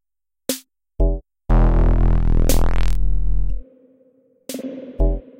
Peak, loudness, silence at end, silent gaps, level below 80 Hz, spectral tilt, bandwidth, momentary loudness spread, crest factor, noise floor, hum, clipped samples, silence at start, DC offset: -4 dBFS; -22 LUFS; 0 s; none; -20 dBFS; -6 dB/octave; 16.5 kHz; 13 LU; 14 dB; -57 dBFS; none; under 0.1%; 0 s; under 0.1%